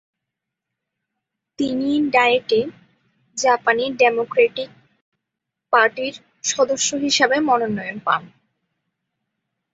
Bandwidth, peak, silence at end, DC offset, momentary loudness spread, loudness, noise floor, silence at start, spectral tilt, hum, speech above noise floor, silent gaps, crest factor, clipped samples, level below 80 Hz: 8 kHz; -2 dBFS; 1.5 s; under 0.1%; 10 LU; -19 LUFS; -83 dBFS; 1.6 s; -2.5 dB/octave; none; 64 dB; 5.01-5.12 s; 20 dB; under 0.1%; -64 dBFS